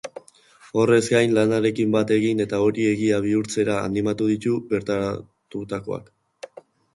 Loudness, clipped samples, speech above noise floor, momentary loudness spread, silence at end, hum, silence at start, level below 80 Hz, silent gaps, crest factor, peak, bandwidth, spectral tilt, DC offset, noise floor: -22 LUFS; under 0.1%; 31 dB; 16 LU; 0.9 s; none; 0.05 s; -56 dBFS; none; 18 dB; -6 dBFS; 11.5 kHz; -6 dB/octave; under 0.1%; -52 dBFS